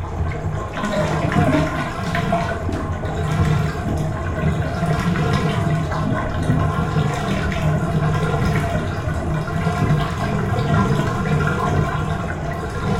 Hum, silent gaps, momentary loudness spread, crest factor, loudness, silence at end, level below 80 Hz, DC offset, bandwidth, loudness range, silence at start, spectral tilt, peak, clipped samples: none; none; 6 LU; 16 dB; -21 LUFS; 0 s; -32 dBFS; under 0.1%; 13.5 kHz; 1 LU; 0 s; -7 dB/octave; -4 dBFS; under 0.1%